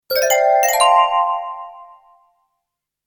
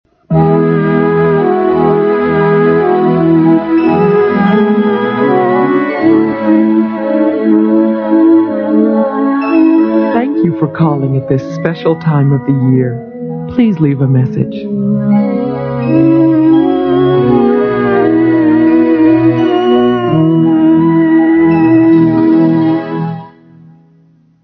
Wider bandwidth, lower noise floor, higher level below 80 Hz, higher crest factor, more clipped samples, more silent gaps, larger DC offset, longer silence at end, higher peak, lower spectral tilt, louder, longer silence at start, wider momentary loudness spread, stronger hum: first, 19.5 kHz vs 5.4 kHz; first, -79 dBFS vs -47 dBFS; second, -60 dBFS vs -46 dBFS; first, 18 dB vs 10 dB; neither; neither; neither; about the same, 1.2 s vs 1.15 s; about the same, 0 dBFS vs 0 dBFS; second, 2 dB/octave vs -10.5 dB/octave; second, -15 LUFS vs -10 LUFS; second, 0.1 s vs 0.3 s; first, 18 LU vs 6 LU; neither